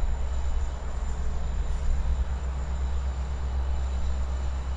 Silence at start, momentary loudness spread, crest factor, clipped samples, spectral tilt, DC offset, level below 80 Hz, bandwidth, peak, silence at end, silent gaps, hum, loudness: 0 s; 3 LU; 12 dB; under 0.1%; -6.5 dB/octave; under 0.1%; -28 dBFS; 7.8 kHz; -14 dBFS; 0 s; none; none; -32 LUFS